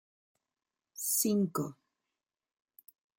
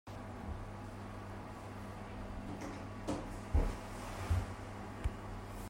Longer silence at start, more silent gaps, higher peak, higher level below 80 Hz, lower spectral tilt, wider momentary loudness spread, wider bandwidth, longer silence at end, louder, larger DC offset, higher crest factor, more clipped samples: first, 0.95 s vs 0.05 s; neither; first, -16 dBFS vs -20 dBFS; second, -82 dBFS vs -44 dBFS; second, -4.5 dB/octave vs -6.5 dB/octave; first, 14 LU vs 10 LU; about the same, 17 kHz vs 16 kHz; first, 1.45 s vs 0 s; first, -32 LUFS vs -43 LUFS; neither; about the same, 22 dB vs 22 dB; neither